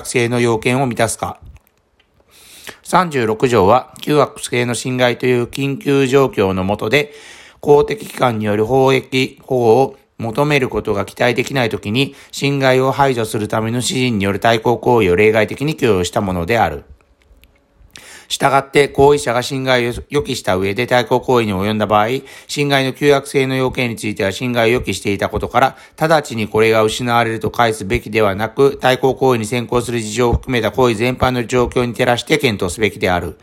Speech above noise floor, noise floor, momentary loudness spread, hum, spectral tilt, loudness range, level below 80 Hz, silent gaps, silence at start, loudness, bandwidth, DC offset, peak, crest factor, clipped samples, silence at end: 43 dB; -58 dBFS; 6 LU; none; -5 dB/octave; 2 LU; -40 dBFS; none; 0 s; -16 LUFS; 16.5 kHz; under 0.1%; 0 dBFS; 16 dB; under 0.1%; 0.1 s